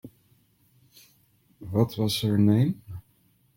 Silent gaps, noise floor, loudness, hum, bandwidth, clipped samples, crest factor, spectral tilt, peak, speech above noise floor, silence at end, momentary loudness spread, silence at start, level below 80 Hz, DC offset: none; -65 dBFS; -24 LUFS; none; 16.5 kHz; under 0.1%; 20 dB; -7 dB/octave; -8 dBFS; 42 dB; 0.55 s; 23 LU; 0.05 s; -60 dBFS; under 0.1%